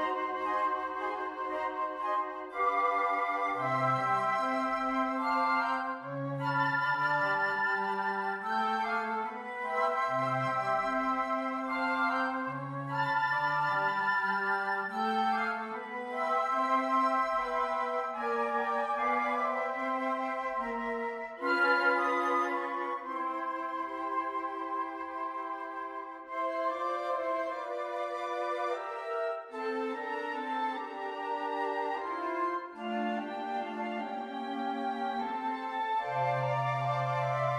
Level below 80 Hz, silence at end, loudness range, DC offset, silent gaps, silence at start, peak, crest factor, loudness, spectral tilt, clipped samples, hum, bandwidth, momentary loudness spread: -70 dBFS; 0 s; 5 LU; under 0.1%; none; 0 s; -16 dBFS; 16 dB; -32 LUFS; -6 dB/octave; under 0.1%; none; 13 kHz; 8 LU